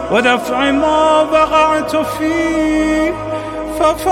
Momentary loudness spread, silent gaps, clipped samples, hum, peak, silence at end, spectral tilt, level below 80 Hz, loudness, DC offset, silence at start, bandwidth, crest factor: 8 LU; none; under 0.1%; none; -2 dBFS; 0 s; -4.5 dB/octave; -36 dBFS; -14 LUFS; under 0.1%; 0 s; 16 kHz; 12 dB